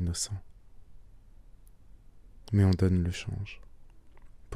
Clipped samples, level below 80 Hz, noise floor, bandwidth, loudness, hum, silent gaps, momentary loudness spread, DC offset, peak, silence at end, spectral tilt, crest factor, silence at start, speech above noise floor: under 0.1%; -48 dBFS; -52 dBFS; 12 kHz; -29 LUFS; none; none; 18 LU; under 0.1%; -14 dBFS; 0 s; -6 dB/octave; 18 dB; 0 s; 24 dB